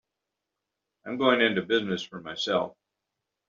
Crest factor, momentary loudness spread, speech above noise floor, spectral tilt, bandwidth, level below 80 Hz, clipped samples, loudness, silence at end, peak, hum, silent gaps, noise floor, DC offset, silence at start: 22 dB; 15 LU; 59 dB; -2 dB/octave; 7.4 kHz; -72 dBFS; under 0.1%; -26 LUFS; 0.8 s; -6 dBFS; none; none; -85 dBFS; under 0.1%; 1.05 s